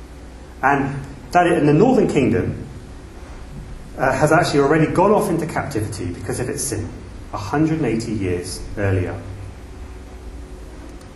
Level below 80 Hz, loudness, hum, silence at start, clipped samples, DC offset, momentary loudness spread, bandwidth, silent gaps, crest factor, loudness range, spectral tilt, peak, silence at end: -38 dBFS; -19 LUFS; none; 0 s; under 0.1%; under 0.1%; 22 LU; 13 kHz; none; 20 dB; 5 LU; -6 dB/octave; 0 dBFS; 0 s